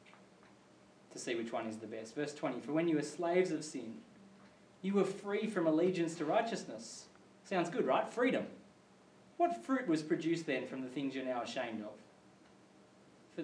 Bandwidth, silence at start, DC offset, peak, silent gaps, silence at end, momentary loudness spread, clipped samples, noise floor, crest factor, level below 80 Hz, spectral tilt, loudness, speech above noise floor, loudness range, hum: 10.5 kHz; 0.05 s; under 0.1%; -20 dBFS; none; 0 s; 13 LU; under 0.1%; -63 dBFS; 18 dB; -88 dBFS; -5.5 dB/octave; -37 LUFS; 27 dB; 3 LU; none